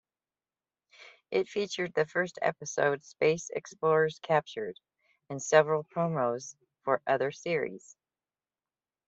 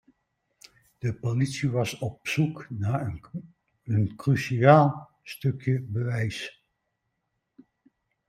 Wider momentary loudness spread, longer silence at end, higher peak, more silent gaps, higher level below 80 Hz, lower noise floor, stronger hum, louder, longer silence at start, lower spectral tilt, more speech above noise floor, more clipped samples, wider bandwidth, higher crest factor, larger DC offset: second, 13 LU vs 20 LU; second, 1.3 s vs 1.8 s; second, -8 dBFS vs -4 dBFS; neither; second, -76 dBFS vs -60 dBFS; first, under -90 dBFS vs -79 dBFS; neither; second, -30 LUFS vs -26 LUFS; about the same, 1 s vs 1.05 s; second, -4.5 dB/octave vs -7 dB/octave; first, over 60 dB vs 54 dB; neither; second, 8 kHz vs 14.5 kHz; about the same, 24 dB vs 22 dB; neither